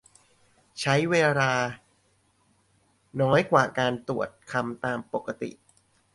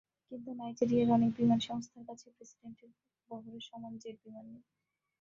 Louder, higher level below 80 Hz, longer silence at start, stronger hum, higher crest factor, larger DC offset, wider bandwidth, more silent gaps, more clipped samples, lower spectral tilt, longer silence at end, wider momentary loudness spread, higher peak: first, -26 LUFS vs -32 LUFS; first, -64 dBFS vs -72 dBFS; first, 0.75 s vs 0.3 s; neither; about the same, 22 dB vs 20 dB; neither; first, 11.5 kHz vs 7.4 kHz; neither; neither; second, -5.5 dB/octave vs -7 dB/octave; about the same, 0.65 s vs 0.65 s; second, 15 LU vs 25 LU; first, -6 dBFS vs -16 dBFS